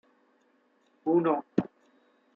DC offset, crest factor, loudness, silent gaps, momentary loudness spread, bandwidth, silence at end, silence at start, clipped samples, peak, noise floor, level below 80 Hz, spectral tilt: under 0.1%; 24 dB; -29 LUFS; none; 12 LU; 4.5 kHz; 0.7 s; 1.05 s; under 0.1%; -8 dBFS; -68 dBFS; -74 dBFS; -10 dB/octave